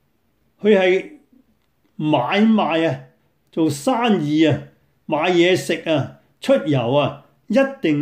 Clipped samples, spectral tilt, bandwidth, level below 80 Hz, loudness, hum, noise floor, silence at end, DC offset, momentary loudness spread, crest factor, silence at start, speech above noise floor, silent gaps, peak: under 0.1%; -6 dB/octave; 15.5 kHz; -64 dBFS; -18 LUFS; none; -65 dBFS; 0 s; under 0.1%; 10 LU; 16 dB; 0.65 s; 48 dB; none; -4 dBFS